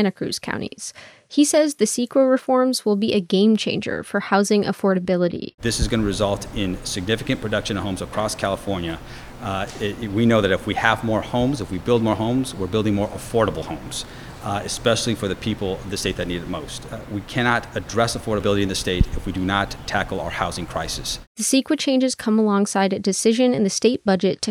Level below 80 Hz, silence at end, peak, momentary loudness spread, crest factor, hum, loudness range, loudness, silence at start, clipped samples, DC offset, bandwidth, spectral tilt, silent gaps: -38 dBFS; 0 s; 0 dBFS; 10 LU; 22 dB; none; 5 LU; -21 LUFS; 0 s; under 0.1%; under 0.1%; 18 kHz; -4.5 dB/octave; 5.54-5.58 s, 21.27-21.35 s